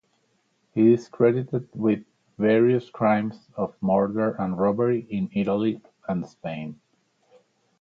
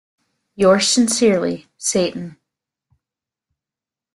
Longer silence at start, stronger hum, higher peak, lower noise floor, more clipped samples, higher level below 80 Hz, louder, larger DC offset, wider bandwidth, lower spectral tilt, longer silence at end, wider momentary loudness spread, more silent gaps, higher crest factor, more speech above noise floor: first, 0.75 s vs 0.6 s; neither; second, -6 dBFS vs -2 dBFS; second, -69 dBFS vs -89 dBFS; neither; about the same, -62 dBFS vs -58 dBFS; second, -24 LUFS vs -17 LUFS; neither; second, 7 kHz vs 12.5 kHz; first, -9 dB/octave vs -3.5 dB/octave; second, 1.05 s vs 1.85 s; about the same, 13 LU vs 12 LU; neither; about the same, 18 dB vs 18 dB; second, 46 dB vs 72 dB